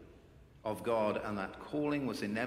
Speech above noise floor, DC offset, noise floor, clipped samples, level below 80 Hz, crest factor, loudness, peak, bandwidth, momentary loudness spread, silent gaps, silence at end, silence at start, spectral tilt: 23 dB; under 0.1%; -59 dBFS; under 0.1%; -64 dBFS; 16 dB; -36 LUFS; -20 dBFS; 16 kHz; 8 LU; none; 0 s; 0 s; -6 dB/octave